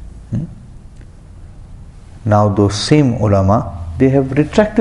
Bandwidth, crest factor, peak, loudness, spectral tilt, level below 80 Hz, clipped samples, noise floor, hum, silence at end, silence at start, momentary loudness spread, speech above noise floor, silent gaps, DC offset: 11 kHz; 16 dB; 0 dBFS; -14 LUFS; -7 dB/octave; -32 dBFS; under 0.1%; -36 dBFS; none; 0 s; 0 s; 13 LU; 24 dB; none; under 0.1%